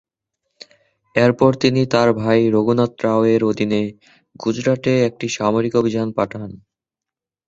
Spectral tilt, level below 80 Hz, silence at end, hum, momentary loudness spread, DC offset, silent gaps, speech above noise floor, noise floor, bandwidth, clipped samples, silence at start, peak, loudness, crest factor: -6.5 dB/octave; -54 dBFS; 0.9 s; none; 9 LU; under 0.1%; none; 70 dB; -87 dBFS; 8 kHz; under 0.1%; 1.15 s; -2 dBFS; -18 LUFS; 18 dB